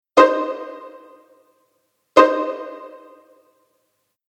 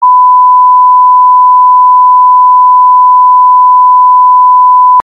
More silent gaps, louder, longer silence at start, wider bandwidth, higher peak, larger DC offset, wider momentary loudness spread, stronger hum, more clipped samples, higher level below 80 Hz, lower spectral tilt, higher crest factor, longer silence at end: neither; second, -17 LUFS vs -3 LUFS; first, 0.15 s vs 0 s; first, 9.4 kHz vs 1.2 kHz; about the same, 0 dBFS vs 0 dBFS; neither; first, 25 LU vs 0 LU; neither; neither; first, -62 dBFS vs -74 dBFS; second, -3.5 dB/octave vs -5.5 dB/octave; first, 22 dB vs 4 dB; first, 1.4 s vs 0 s